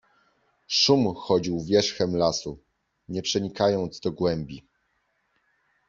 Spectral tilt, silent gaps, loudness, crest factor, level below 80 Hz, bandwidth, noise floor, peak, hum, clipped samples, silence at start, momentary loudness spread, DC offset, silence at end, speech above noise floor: -4.5 dB/octave; none; -24 LUFS; 20 dB; -58 dBFS; 7.6 kHz; -72 dBFS; -6 dBFS; none; under 0.1%; 0.7 s; 13 LU; under 0.1%; 1.3 s; 48 dB